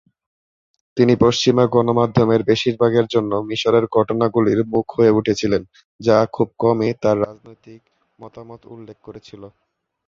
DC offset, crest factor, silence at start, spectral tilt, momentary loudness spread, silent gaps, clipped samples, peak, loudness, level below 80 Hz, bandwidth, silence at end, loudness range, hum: under 0.1%; 18 dB; 0.95 s; -6.5 dB/octave; 14 LU; 5.85-5.99 s; under 0.1%; -2 dBFS; -17 LUFS; -50 dBFS; 7.6 kHz; 0.6 s; 7 LU; none